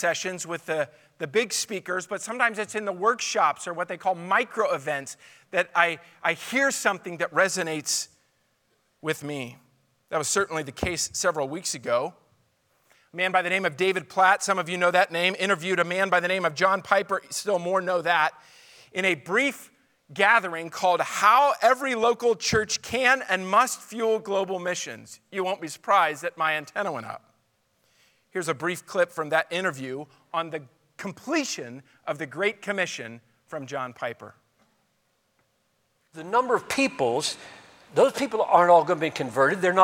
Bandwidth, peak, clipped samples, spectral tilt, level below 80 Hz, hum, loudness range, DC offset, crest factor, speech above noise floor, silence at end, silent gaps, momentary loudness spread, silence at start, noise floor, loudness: 19 kHz; -2 dBFS; under 0.1%; -3 dB/octave; -64 dBFS; none; 8 LU; under 0.1%; 24 dB; 46 dB; 0 s; none; 14 LU; 0 s; -71 dBFS; -25 LUFS